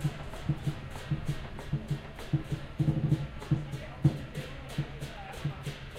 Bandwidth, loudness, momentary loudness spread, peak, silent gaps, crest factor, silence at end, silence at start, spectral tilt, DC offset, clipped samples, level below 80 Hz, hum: 14 kHz; -35 LUFS; 10 LU; -12 dBFS; none; 20 dB; 0 s; 0 s; -7 dB/octave; under 0.1%; under 0.1%; -46 dBFS; none